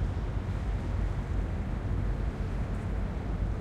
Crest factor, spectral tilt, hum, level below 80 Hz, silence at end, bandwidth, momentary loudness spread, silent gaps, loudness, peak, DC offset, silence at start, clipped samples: 12 dB; -8 dB/octave; none; -34 dBFS; 0 s; 8.4 kHz; 1 LU; none; -34 LUFS; -20 dBFS; under 0.1%; 0 s; under 0.1%